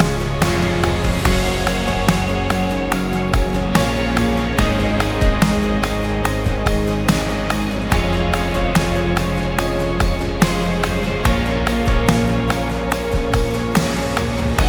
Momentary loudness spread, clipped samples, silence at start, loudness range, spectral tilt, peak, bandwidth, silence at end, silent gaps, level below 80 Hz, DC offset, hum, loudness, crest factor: 3 LU; under 0.1%; 0 s; 1 LU; -5.5 dB/octave; 0 dBFS; over 20 kHz; 0 s; none; -24 dBFS; under 0.1%; none; -19 LUFS; 18 dB